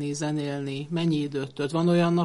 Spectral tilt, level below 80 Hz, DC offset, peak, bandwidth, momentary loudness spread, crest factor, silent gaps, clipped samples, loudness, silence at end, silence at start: -6.5 dB/octave; -64 dBFS; under 0.1%; -10 dBFS; 11.5 kHz; 9 LU; 14 dB; none; under 0.1%; -27 LUFS; 0 s; 0 s